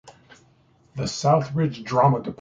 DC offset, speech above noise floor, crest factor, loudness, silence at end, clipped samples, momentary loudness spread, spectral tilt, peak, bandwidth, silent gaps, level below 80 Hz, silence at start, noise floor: under 0.1%; 37 dB; 20 dB; -22 LUFS; 0.05 s; under 0.1%; 11 LU; -6.5 dB/octave; -4 dBFS; 7.8 kHz; none; -56 dBFS; 0.05 s; -59 dBFS